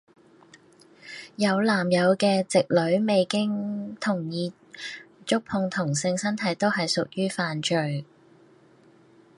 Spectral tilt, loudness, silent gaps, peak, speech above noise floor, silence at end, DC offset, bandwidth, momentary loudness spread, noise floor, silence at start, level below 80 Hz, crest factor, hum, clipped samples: -5 dB/octave; -25 LUFS; none; -8 dBFS; 32 dB; 1.35 s; under 0.1%; 11.5 kHz; 15 LU; -56 dBFS; 1.05 s; -70 dBFS; 20 dB; none; under 0.1%